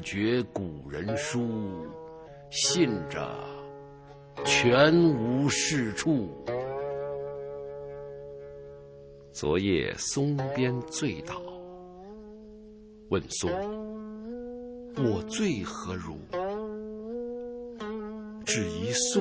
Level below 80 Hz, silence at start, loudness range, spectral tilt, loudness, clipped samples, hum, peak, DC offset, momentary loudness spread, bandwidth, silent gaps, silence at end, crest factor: -54 dBFS; 0 s; 10 LU; -4.5 dB/octave; -29 LUFS; under 0.1%; none; -8 dBFS; under 0.1%; 21 LU; 8 kHz; none; 0 s; 22 dB